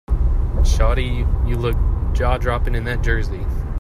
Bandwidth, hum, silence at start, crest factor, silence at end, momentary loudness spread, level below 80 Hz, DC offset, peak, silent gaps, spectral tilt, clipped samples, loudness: 11.5 kHz; none; 0.1 s; 14 dB; 0 s; 4 LU; -18 dBFS; under 0.1%; -4 dBFS; none; -6.5 dB/octave; under 0.1%; -21 LUFS